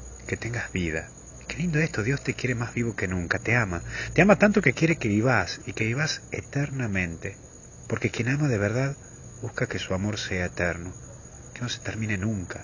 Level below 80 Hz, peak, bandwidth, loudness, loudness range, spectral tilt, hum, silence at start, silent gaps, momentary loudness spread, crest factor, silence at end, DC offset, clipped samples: -46 dBFS; -4 dBFS; 7.4 kHz; -26 LUFS; 7 LU; -5.5 dB/octave; none; 0 s; none; 17 LU; 24 dB; 0 s; under 0.1%; under 0.1%